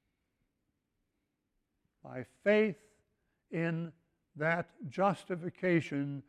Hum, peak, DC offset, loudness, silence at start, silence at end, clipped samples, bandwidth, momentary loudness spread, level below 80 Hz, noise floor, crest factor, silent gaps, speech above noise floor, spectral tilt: none; -16 dBFS; under 0.1%; -33 LUFS; 2.05 s; 0.1 s; under 0.1%; 10.5 kHz; 17 LU; -76 dBFS; -83 dBFS; 20 dB; none; 50 dB; -7.5 dB/octave